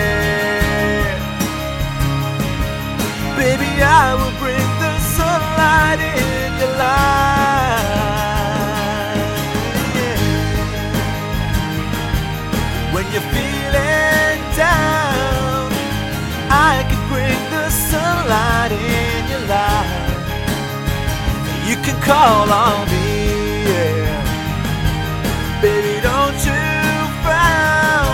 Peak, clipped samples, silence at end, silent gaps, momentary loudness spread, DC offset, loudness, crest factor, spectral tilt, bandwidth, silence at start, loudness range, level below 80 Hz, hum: 0 dBFS; under 0.1%; 0 s; none; 8 LU; under 0.1%; -16 LUFS; 16 dB; -4.5 dB/octave; 17 kHz; 0 s; 4 LU; -26 dBFS; none